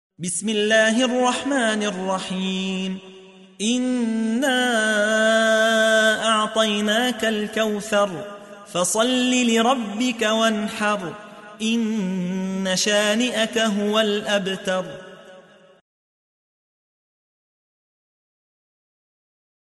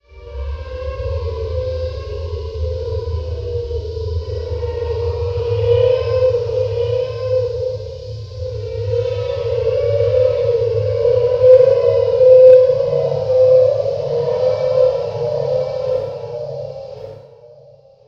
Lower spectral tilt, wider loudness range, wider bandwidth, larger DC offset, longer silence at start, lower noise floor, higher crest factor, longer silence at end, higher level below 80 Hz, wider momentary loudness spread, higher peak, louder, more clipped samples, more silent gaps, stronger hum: second, -3 dB/octave vs -7.5 dB/octave; second, 5 LU vs 12 LU; first, 12 kHz vs 6.4 kHz; neither; about the same, 0.2 s vs 0.15 s; about the same, -48 dBFS vs -45 dBFS; about the same, 16 dB vs 16 dB; first, 4.35 s vs 0.6 s; second, -66 dBFS vs -34 dBFS; second, 10 LU vs 17 LU; second, -6 dBFS vs 0 dBFS; second, -20 LUFS vs -16 LUFS; neither; neither; neither